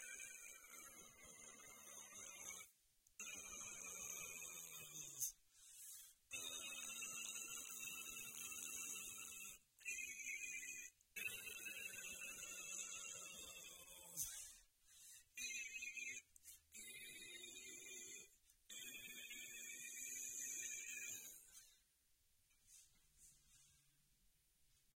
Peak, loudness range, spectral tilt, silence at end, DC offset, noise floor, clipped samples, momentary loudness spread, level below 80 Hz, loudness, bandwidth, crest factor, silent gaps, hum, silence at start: -30 dBFS; 5 LU; 1 dB/octave; 0.2 s; under 0.1%; -80 dBFS; under 0.1%; 14 LU; -82 dBFS; -51 LUFS; 16.5 kHz; 24 dB; none; none; 0 s